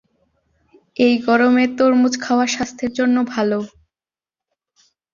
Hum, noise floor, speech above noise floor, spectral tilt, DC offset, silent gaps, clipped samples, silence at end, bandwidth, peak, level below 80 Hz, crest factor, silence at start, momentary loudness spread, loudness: none; under -90 dBFS; over 74 dB; -4 dB/octave; under 0.1%; none; under 0.1%; 1.45 s; 7.4 kHz; -2 dBFS; -58 dBFS; 16 dB; 1 s; 9 LU; -17 LUFS